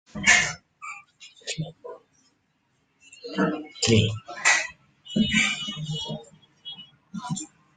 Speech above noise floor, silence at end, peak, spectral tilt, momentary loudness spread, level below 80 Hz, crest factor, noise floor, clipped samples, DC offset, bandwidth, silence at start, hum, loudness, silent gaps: 49 dB; 0.3 s; -4 dBFS; -3 dB/octave; 21 LU; -56 dBFS; 24 dB; -70 dBFS; under 0.1%; under 0.1%; 9.8 kHz; 0.15 s; none; -24 LUFS; none